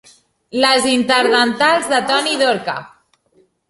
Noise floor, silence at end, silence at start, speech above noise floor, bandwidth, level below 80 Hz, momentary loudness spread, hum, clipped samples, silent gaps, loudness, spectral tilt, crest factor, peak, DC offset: -57 dBFS; 0.85 s; 0.55 s; 42 dB; 11.5 kHz; -60 dBFS; 11 LU; none; under 0.1%; none; -15 LUFS; -2 dB/octave; 16 dB; 0 dBFS; under 0.1%